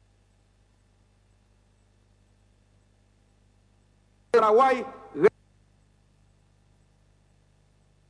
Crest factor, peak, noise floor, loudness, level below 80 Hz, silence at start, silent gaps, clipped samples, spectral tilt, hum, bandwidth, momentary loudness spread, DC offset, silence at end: 24 dB; -8 dBFS; -63 dBFS; -23 LUFS; -66 dBFS; 4.35 s; none; under 0.1%; -5.5 dB/octave; 50 Hz at -60 dBFS; 10 kHz; 9 LU; under 0.1%; 2.8 s